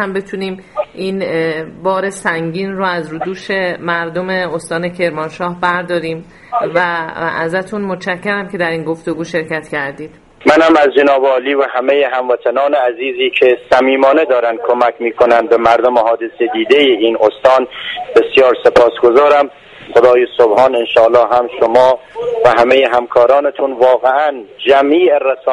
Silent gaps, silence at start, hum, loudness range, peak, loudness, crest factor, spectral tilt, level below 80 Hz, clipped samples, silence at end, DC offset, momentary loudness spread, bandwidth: none; 0 s; none; 7 LU; 0 dBFS; -12 LUFS; 12 dB; -5.5 dB/octave; -50 dBFS; 0.1%; 0 s; under 0.1%; 11 LU; 11.5 kHz